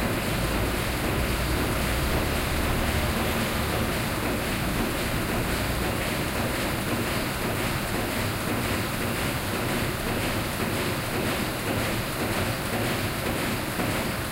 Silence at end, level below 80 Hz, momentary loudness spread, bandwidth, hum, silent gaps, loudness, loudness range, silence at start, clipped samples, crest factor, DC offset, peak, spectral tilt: 0 s; -36 dBFS; 2 LU; 16 kHz; none; none; -27 LUFS; 1 LU; 0 s; under 0.1%; 14 dB; under 0.1%; -12 dBFS; -4.5 dB/octave